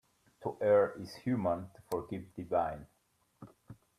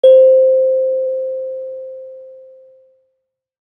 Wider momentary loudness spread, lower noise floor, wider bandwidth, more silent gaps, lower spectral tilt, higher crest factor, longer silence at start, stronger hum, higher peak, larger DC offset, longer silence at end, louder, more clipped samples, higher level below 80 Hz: second, 15 LU vs 23 LU; second, -58 dBFS vs -72 dBFS; first, 15 kHz vs 3.6 kHz; neither; first, -7.5 dB/octave vs -4.5 dB/octave; first, 20 dB vs 14 dB; first, 0.4 s vs 0.05 s; neither; second, -16 dBFS vs -2 dBFS; neither; second, 0.25 s vs 1.35 s; second, -34 LUFS vs -13 LUFS; neither; first, -66 dBFS vs -76 dBFS